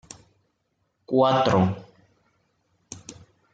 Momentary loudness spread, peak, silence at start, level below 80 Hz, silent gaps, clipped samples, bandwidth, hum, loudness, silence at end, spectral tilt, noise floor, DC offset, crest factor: 25 LU; -6 dBFS; 1.1 s; -60 dBFS; none; under 0.1%; 9.2 kHz; none; -22 LUFS; 0.4 s; -6.5 dB/octave; -74 dBFS; under 0.1%; 20 dB